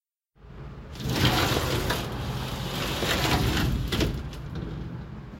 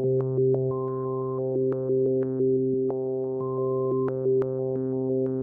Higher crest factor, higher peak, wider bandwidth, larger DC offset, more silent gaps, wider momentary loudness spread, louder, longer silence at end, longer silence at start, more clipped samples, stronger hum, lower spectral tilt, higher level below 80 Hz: first, 18 dB vs 10 dB; first, -10 dBFS vs -14 dBFS; first, 17 kHz vs 2 kHz; neither; neither; first, 15 LU vs 5 LU; about the same, -27 LUFS vs -26 LUFS; about the same, 0 s vs 0 s; first, 0.4 s vs 0 s; neither; neither; second, -4.5 dB/octave vs -14 dB/octave; first, -36 dBFS vs -66 dBFS